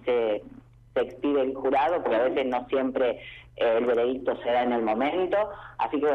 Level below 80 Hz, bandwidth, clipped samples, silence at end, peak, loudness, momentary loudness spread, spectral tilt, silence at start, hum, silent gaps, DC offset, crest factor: -58 dBFS; 6.2 kHz; under 0.1%; 0 s; -14 dBFS; -26 LUFS; 7 LU; -7 dB/octave; 0.05 s; 50 Hz at -60 dBFS; none; under 0.1%; 12 dB